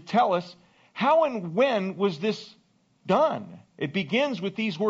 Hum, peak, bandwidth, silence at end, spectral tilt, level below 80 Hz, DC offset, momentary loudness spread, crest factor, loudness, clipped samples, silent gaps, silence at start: none; -10 dBFS; 7.8 kHz; 0 s; -4 dB/octave; -74 dBFS; under 0.1%; 13 LU; 16 dB; -26 LUFS; under 0.1%; none; 0.05 s